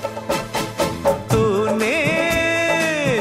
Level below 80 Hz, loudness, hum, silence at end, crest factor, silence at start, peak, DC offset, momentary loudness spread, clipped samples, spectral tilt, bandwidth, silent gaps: -42 dBFS; -19 LUFS; none; 0 s; 14 dB; 0 s; -4 dBFS; under 0.1%; 6 LU; under 0.1%; -4.5 dB/octave; 16 kHz; none